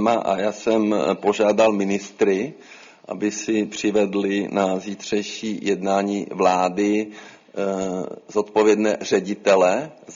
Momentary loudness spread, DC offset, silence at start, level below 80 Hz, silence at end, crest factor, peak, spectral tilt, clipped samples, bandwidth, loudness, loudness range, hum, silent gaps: 10 LU; under 0.1%; 0 s; -64 dBFS; 0 s; 16 dB; -4 dBFS; -5 dB/octave; under 0.1%; 7.6 kHz; -21 LUFS; 2 LU; none; none